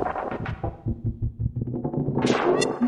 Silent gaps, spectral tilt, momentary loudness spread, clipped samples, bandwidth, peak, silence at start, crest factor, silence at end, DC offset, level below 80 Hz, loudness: none; -6 dB/octave; 9 LU; under 0.1%; 11.5 kHz; -8 dBFS; 0 s; 18 dB; 0 s; under 0.1%; -40 dBFS; -27 LUFS